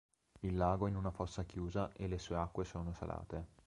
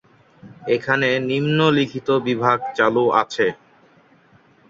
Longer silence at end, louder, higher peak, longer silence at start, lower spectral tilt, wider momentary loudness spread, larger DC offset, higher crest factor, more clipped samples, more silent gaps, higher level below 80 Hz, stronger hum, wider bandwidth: second, 0.2 s vs 1.15 s; second, -41 LUFS vs -19 LUFS; second, -20 dBFS vs -2 dBFS; about the same, 0.35 s vs 0.45 s; first, -7.5 dB/octave vs -6 dB/octave; first, 10 LU vs 6 LU; neither; about the same, 20 dB vs 20 dB; neither; neither; first, -52 dBFS vs -62 dBFS; neither; first, 10.5 kHz vs 7.6 kHz